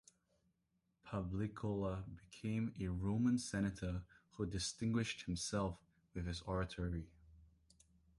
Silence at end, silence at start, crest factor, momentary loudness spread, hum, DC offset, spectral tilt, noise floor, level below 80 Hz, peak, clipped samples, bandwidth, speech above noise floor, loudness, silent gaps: 0.75 s; 1.05 s; 16 dB; 11 LU; none; under 0.1%; -5.5 dB/octave; -84 dBFS; -56 dBFS; -26 dBFS; under 0.1%; 11.5 kHz; 43 dB; -42 LUFS; none